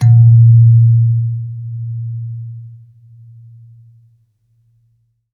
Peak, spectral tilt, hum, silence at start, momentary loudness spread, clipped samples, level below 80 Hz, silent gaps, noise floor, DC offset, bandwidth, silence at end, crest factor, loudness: -2 dBFS; -10 dB/octave; none; 0 s; 21 LU; under 0.1%; -58 dBFS; none; -59 dBFS; under 0.1%; 0.8 kHz; 2.65 s; 12 dB; -11 LUFS